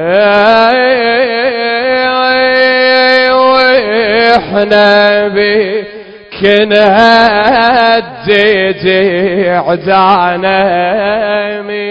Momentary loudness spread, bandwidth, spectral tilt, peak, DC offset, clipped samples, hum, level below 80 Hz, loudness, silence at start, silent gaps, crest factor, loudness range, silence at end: 6 LU; 8 kHz; -6 dB/octave; 0 dBFS; under 0.1%; 0.5%; none; -44 dBFS; -8 LUFS; 0 s; none; 8 dB; 2 LU; 0 s